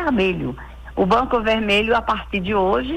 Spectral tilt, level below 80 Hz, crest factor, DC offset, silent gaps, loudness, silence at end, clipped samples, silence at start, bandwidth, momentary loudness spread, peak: -6 dB/octave; -36 dBFS; 12 dB; under 0.1%; none; -19 LUFS; 0 s; under 0.1%; 0 s; 13.5 kHz; 11 LU; -8 dBFS